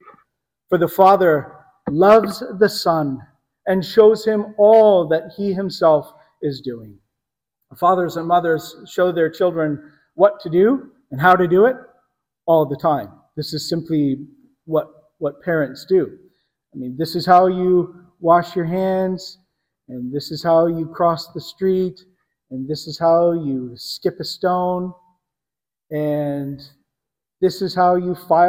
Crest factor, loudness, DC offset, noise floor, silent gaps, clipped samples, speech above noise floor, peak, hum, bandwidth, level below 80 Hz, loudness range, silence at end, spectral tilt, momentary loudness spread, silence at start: 18 dB; -18 LUFS; under 0.1%; -89 dBFS; none; under 0.1%; 71 dB; 0 dBFS; none; 16.5 kHz; -60 dBFS; 7 LU; 0 s; -6.5 dB/octave; 17 LU; 0.7 s